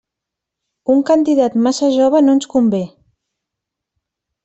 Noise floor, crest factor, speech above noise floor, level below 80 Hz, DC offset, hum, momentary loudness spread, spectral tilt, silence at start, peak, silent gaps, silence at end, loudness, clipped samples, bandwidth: -82 dBFS; 14 dB; 69 dB; -58 dBFS; under 0.1%; none; 9 LU; -6 dB/octave; 0.9 s; -2 dBFS; none; 1.55 s; -14 LUFS; under 0.1%; 8.2 kHz